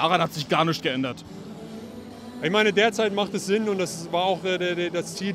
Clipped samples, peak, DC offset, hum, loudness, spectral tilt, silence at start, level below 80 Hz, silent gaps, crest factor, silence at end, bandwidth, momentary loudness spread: under 0.1%; -6 dBFS; under 0.1%; none; -24 LUFS; -4.5 dB/octave; 0 s; -64 dBFS; none; 20 dB; 0 s; 16 kHz; 18 LU